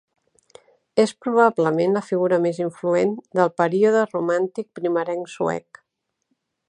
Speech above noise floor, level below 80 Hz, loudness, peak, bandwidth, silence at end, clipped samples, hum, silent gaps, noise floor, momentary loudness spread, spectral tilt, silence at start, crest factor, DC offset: 57 dB; -70 dBFS; -21 LUFS; -2 dBFS; 10.5 kHz; 1.1 s; under 0.1%; none; none; -78 dBFS; 8 LU; -6.5 dB/octave; 0.95 s; 20 dB; under 0.1%